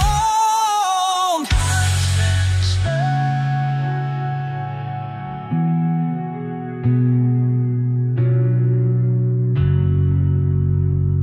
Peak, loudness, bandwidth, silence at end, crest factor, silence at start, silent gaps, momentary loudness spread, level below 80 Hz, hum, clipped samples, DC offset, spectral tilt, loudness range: -6 dBFS; -19 LUFS; 13.5 kHz; 0 s; 12 dB; 0 s; none; 9 LU; -32 dBFS; none; under 0.1%; under 0.1%; -5.5 dB/octave; 4 LU